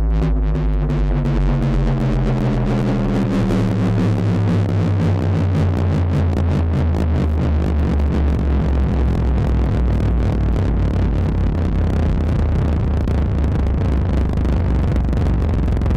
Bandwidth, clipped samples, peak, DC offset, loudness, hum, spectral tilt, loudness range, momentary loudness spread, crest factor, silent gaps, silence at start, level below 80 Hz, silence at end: 8.2 kHz; under 0.1%; -10 dBFS; under 0.1%; -18 LUFS; none; -9 dB/octave; 1 LU; 2 LU; 6 dB; none; 0 s; -20 dBFS; 0 s